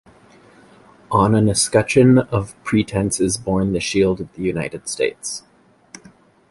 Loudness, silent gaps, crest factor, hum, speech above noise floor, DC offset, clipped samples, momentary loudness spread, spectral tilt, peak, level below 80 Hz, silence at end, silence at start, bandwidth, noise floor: -18 LUFS; none; 18 dB; none; 32 dB; under 0.1%; under 0.1%; 11 LU; -5 dB/octave; -2 dBFS; -44 dBFS; 1.1 s; 1.1 s; 11.5 kHz; -49 dBFS